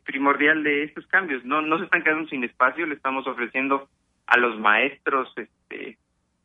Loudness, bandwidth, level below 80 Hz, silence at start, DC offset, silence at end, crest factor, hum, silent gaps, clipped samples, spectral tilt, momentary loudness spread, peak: -22 LUFS; 8.6 kHz; -72 dBFS; 0.05 s; under 0.1%; 0.55 s; 22 dB; none; none; under 0.1%; -6 dB/octave; 16 LU; -2 dBFS